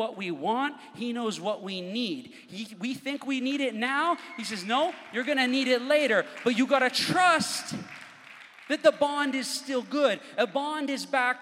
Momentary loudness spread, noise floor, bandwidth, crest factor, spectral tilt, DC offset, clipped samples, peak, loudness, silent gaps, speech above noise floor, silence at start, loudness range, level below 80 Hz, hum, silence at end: 14 LU; -49 dBFS; 16 kHz; 20 dB; -3.5 dB/octave; under 0.1%; under 0.1%; -8 dBFS; -27 LUFS; none; 22 dB; 0 s; 7 LU; -80 dBFS; none; 0 s